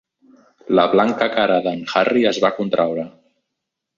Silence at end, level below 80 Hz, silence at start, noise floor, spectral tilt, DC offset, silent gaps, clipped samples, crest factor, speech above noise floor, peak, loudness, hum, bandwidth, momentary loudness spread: 0.9 s; -60 dBFS; 0.7 s; -80 dBFS; -5.5 dB/octave; under 0.1%; none; under 0.1%; 16 dB; 62 dB; -2 dBFS; -18 LUFS; none; 7.6 kHz; 6 LU